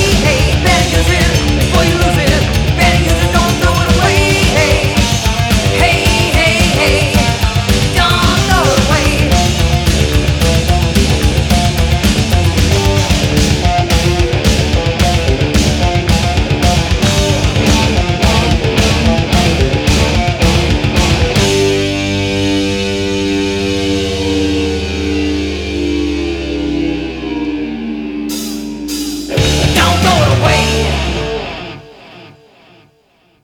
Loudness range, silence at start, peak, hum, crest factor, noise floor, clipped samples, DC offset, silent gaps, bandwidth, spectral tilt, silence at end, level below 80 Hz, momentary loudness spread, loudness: 5 LU; 0 s; 0 dBFS; none; 12 dB; -53 dBFS; under 0.1%; under 0.1%; none; 20 kHz; -4.5 dB/octave; 1.15 s; -18 dBFS; 8 LU; -12 LUFS